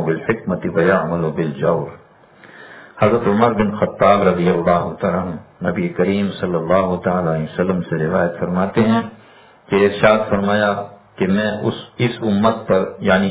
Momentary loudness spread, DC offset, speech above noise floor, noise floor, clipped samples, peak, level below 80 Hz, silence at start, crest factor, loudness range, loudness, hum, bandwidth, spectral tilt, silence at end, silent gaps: 9 LU; under 0.1%; 29 dB; -46 dBFS; under 0.1%; 0 dBFS; -46 dBFS; 0 s; 18 dB; 2 LU; -18 LUFS; none; 4 kHz; -11 dB/octave; 0 s; none